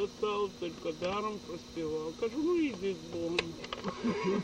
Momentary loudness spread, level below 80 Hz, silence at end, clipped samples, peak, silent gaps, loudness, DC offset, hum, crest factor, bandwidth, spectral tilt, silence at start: 8 LU; -60 dBFS; 0 s; under 0.1%; -14 dBFS; none; -35 LUFS; under 0.1%; none; 20 dB; 11.5 kHz; -5.5 dB/octave; 0 s